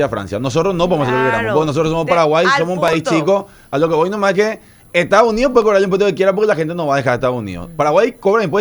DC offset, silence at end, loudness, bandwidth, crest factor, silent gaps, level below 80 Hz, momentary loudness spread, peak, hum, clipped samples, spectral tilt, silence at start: under 0.1%; 0 s; -15 LUFS; over 20 kHz; 14 dB; none; -42 dBFS; 7 LU; 0 dBFS; none; under 0.1%; -5.5 dB/octave; 0 s